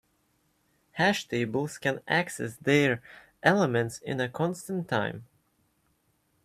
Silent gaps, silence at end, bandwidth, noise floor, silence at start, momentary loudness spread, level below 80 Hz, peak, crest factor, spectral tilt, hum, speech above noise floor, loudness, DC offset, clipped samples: none; 1.2 s; 15.5 kHz; -71 dBFS; 0.95 s; 10 LU; -68 dBFS; -6 dBFS; 24 dB; -5 dB/octave; none; 44 dB; -28 LUFS; under 0.1%; under 0.1%